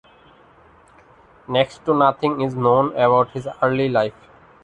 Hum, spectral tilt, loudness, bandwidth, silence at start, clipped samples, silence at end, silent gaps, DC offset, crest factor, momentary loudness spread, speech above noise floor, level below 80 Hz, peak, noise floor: none; -7.5 dB/octave; -19 LUFS; 9.4 kHz; 1.5 s; under 0.1%; 0.55 s; none; under 0.1%; 18 dB; 6 LU; 32 dB; -56 dBFS; -2 dBFS; -51 dBFS